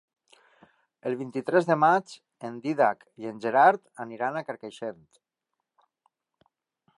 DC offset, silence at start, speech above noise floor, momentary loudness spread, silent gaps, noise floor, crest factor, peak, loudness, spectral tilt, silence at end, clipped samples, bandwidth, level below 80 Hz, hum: under 0.1%; 1.05 s; 58 dB; 18 LU; none; -85 dBFS; 22 dB; -6 dBFS; -26 LUFS; -6.5 dB/octave; 2.05 s; under 0.1%; 11.5 kHz; -82 dBFS; none